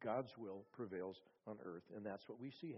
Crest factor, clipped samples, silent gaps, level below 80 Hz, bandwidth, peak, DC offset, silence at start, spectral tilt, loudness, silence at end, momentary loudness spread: 18 dB; under 0.1%; none; -88 dBFS; 5.8 kHz; -30 dBFS; under 0.1%; 0 s; -5.5 dB/octave; -51 LUFS; 0 s; 8 LU